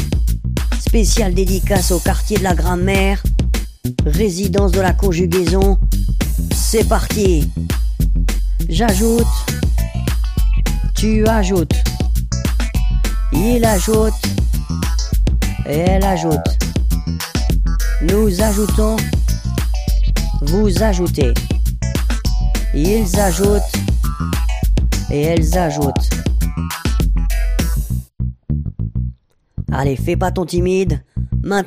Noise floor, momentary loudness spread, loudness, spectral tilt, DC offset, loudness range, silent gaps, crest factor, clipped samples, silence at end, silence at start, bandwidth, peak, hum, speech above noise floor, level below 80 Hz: -35 dBFS; 6 LU; -17 LUFS; -5.5 dB/octave; under 0.1%; 3 LU; none; 14 dB; under 0.1%; 0 s; 0 s; 15.5 kHz; 0 dBFS; none; 21 dB; -18 dBFS